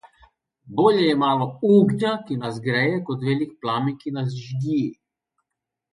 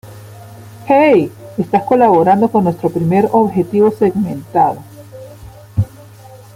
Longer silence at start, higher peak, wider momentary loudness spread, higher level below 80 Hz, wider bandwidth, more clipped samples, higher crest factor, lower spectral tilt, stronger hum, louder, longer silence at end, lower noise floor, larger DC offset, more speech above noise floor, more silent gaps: first, 0.65 s vs 0.05 s; second, -4 dBFS vs 0 dBFS; second, 11 LU vs 14 LU; second, -64 dBFS vs -48 dBFS; second, 11 kHz vs 16 kHz; neither; about the same, 18 dB vs 14 dB; about the same, -7.5 dB/octave vs -8.5 dB/octave; neither; second, -22 LUFS vs -14 LUFS; first, 1 s vs 0.2 s; first, -83 dBFS vs -37 dBFS; neither; first, 62 dB vs 25 dB; neither